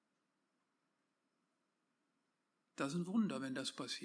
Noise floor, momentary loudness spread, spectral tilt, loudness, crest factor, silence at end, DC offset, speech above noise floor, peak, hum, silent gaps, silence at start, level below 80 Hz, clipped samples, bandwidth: -86 dBFS; 6 LU; -5 dB/octave; -41 LUFS; 20 dB; 0 s; under 0.1%; 45 dB; -26 dBFS; none; none; 2.75 s; under -90 dBFS; under 0.1%; 10.5 kHz